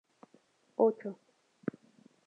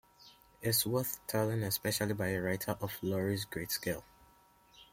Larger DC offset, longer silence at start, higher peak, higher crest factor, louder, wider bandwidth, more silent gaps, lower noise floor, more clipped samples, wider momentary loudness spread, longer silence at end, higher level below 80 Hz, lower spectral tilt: neither; first, 0.8 s vs 0.2 s; first, -14 dBFS vs -18 dBFS; about the same, 24 dB vs 20 dB; about the same, -34 LUFS vs -35 LUFS; second, 4.5 kHz vs 16.5 kHz; neither; about the same, -68 dBFS vs -65 dBFS; neither; first, 15 LU vs 7 LU; first, 1.15 s vs 0.1 s; second, under -90 dBFS vs -64 dBFS; first, -9 dB/octave vs -4 dB/octave